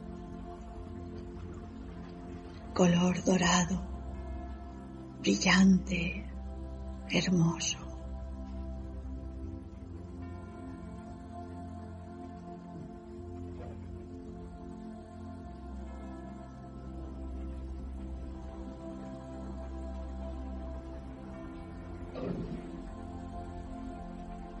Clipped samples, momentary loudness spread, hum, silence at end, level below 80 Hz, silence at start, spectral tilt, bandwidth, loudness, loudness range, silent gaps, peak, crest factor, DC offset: under 0.1%; 18 LU; none; 0 s; -46 dBFS; 0 s; -5 dB/octave; 8.6 kHz; -36 LUFS; 16 LU; none; -12 dBFS; 24 dB; under 0.1%